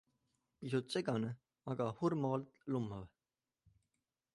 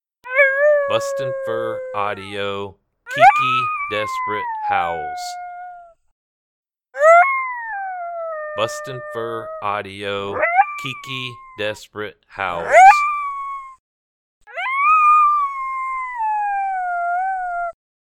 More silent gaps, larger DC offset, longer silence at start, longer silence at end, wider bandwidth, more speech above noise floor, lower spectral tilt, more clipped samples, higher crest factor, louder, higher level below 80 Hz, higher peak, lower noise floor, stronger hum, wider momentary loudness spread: second, none vs 6.12-6.63 s, 13.79-14.41 s; neither; first, 0.6 s vs 0.25 s; first, 1.25 s vs 0.45 s; second, 11.5 kHz vs 15.5 kHz; first, over 51 dB vs 20 dB; first, -7 dB/octave vs -3.5 dB/octave; neither; about the same, 18 dB vs 18 dB; second, -40 LUFS vs -18 LUFS; second, -72 dBFS vs -58 dBFS; second, -22 dBFS vs 0 dBFS; first, under -90 dBFS vs -39 dBFS; neither; second, 14 LU vs 18 LU